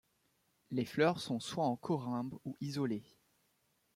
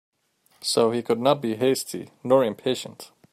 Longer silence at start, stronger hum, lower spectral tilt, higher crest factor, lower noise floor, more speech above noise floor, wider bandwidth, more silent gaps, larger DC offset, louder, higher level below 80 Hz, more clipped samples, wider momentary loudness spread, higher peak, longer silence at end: about the same, 0.7 s vs 0.65 s; neither; first, -6 dB/octave vs -4.5 dB/octave; about the same, 20 dB vs 18 dB; first, -77 dBFS vs -65 dBFS; about the same, 41 dB vs 41 dB; about the same, 16 kHz vs 15.5 kHz; neither; neither; second, -37 LUFS vs -23 LUFS; second, -76 dBFS vs -70 dBFS; neither; second, 10 LU vs 13 LU; second, -18 dBFS vs -6 dBFS; first, 0.95 s vs 0.25 s